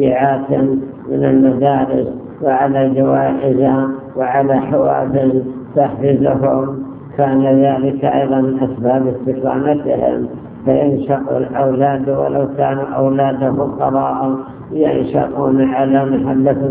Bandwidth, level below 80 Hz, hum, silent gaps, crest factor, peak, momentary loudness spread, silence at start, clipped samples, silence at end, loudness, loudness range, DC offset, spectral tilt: 3.6 kHz; -46 dBFS; none; none; 14 dB; 0 dBFS; 6 LU; 0 s; under 0.1%; 0 s; -15 LUFS; 2 LU; under 0.1%; -12.5 dB/octave